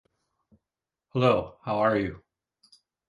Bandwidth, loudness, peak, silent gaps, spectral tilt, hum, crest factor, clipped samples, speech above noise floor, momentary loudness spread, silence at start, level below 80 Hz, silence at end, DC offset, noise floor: 10.5 kHz; -26 LUFS; -8 dBFS; none; -8 dB/octave; none; 22 dB; under 0.1%; 64 dB; 10 LU; 1.15 s; -56 dBFS; 0.9 s; under 0.1%; -89 dBFS